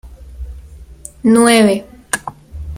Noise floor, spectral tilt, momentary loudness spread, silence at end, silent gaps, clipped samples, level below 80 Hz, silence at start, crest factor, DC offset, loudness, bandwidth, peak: -36 dBFS; -4 dB/octave; 24 LU; 0 s; none; under 0.1%; -34 dBFS; 0.05 s; 16 dB; under 0.1%; -13 LUFS; 15.5 kHz; 0 dBFS